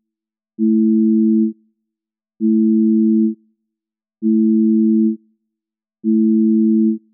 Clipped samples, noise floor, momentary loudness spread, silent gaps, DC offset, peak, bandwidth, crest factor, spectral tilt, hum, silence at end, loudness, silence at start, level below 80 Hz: under 0.1%; -86 dBFS; 8 LU; none; under 0.1%; -8 dBFS; 0.4 kHz; 8 dB; -21 dB/octave; none; 0.15 s; -15 LUFS; 0.6 s; -90 dBFS